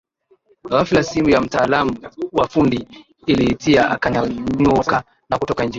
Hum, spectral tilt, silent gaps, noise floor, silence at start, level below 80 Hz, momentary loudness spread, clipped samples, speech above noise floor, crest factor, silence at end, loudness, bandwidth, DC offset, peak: none; -6 dB/octave; none; -57 dBFS; 0.65 s; -42 dBFS; 8 LU; under 0.1%; 40 dB; 16 dB; 0 s; -18 LUFS; 7.8 kHz; under 0.1%; -2 dBFS